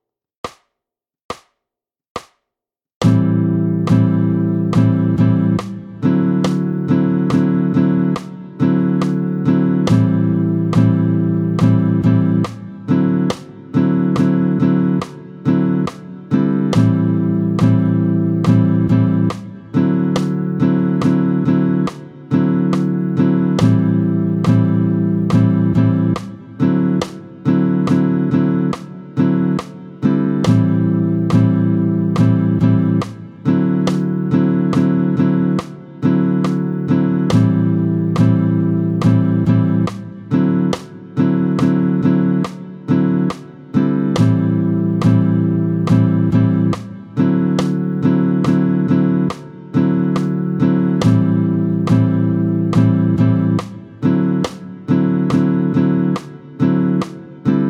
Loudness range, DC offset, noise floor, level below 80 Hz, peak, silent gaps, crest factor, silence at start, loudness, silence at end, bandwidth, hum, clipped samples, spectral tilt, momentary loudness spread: 2 LU; under 0.1%; -85 dBFS; -50 dBFS; -2 dBFS; 1.24-1.29 s, 2.10-2.15 s, 2.94-3.01 s; 14 dB; 0.45 s; -16 LUFS; 0 s; 9.8 kHz; none; under 0.1%; -9 dB/octave; 8 LU